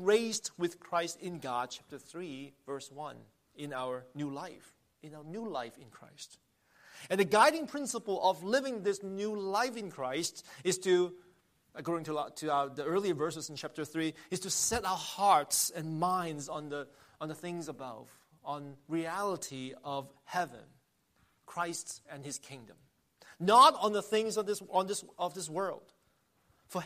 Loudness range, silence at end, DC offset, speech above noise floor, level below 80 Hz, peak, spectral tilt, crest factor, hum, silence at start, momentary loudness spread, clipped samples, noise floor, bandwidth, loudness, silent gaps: 13 LU; 0 s; under 0.1%; 40 dB; -70 dBFS; -10 dBFS; -3.5 dB/octave; 24 dB; none; 0 s; 18 LU; under 0.1%; -73 dBFS; 15 kHz; -33 LUFS; none